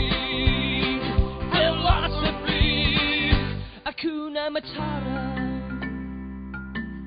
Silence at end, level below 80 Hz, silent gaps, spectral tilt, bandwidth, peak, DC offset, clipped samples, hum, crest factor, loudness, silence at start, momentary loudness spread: 0 s; -30 dBFS; none; -10 dB/octave; 5.2 kHz; -6 dBFS; under 0.1%; under 0.1%; none; 18 dB; -25 LUFS; 0 s; 13 LU